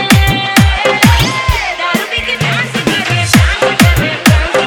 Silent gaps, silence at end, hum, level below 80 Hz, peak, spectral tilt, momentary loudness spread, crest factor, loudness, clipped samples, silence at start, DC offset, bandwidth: none; 0 s; none; -20 dBFS; 0 dBFS; -4.5 dB/octave; 5 LU; 10 dB; -10 LUFS; 0.6%; 0 s; under 0.1%; over 20 kHz